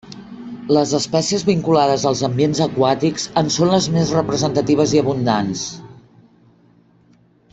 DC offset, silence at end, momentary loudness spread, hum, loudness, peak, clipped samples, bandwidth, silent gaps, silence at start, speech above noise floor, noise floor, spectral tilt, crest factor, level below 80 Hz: under 0.1%; 1.55 s; 11 LU; none; -17 LUFS; -2 dBFS; under 0.1%; 8.4 kHz; none; 0.05 s; 37 dB; -53 dBFS; -5 dB/octave; 16 dB; -52 dBFS